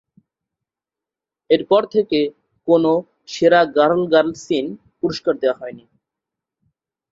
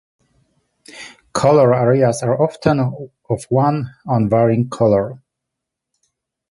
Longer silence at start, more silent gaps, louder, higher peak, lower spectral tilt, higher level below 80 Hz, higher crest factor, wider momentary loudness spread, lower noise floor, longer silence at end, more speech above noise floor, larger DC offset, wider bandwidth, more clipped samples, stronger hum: first, 1.5 s vs 0.95 s; neither; about the same, -18 LUFS vs -16 LUFS; about the same, -2 dBFS vs -2 dBFS; second, -5.5 dB/octave vs -7 dB/octave; second, -60 dBFS vs -50 dBFS; about the same, 18 dB vs 16 dB; about the same, 13 LU vs 15 LU; first, -88 dBFS vs -81 dBFS; about the same, 1.35 s vs 1.35 s; first, 71 dB vs 65 dB; neither; second, 7.8 kHz vs 11.5 kHz; neither; neither